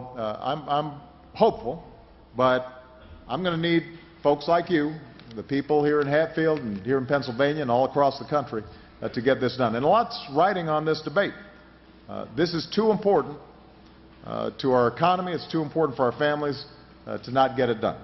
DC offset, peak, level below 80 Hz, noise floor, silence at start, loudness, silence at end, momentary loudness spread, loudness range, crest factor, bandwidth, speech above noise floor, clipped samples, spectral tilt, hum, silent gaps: under 0.1%; -6 dBFS; -56 dBFS; -51 dBFS; 0 s; -25 LUFS; 0 s; 16 LU; 3 LU; 20 dB; 6.2 kHz; 27 dB; under 0.1%; -7.5 dB/octave; none; none